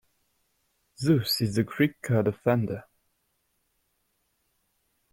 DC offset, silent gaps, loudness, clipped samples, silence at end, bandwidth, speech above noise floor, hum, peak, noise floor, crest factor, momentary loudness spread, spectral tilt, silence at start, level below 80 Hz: under 0.1%; none; -26 LUFS; under 0.1%; 2.3 s; 16.5 kHz; 49 dB; none; -10 dBFS; -74 dBFS; 20 dB; 7 LU; -6 dB/octave; 1 s; -62 dBFS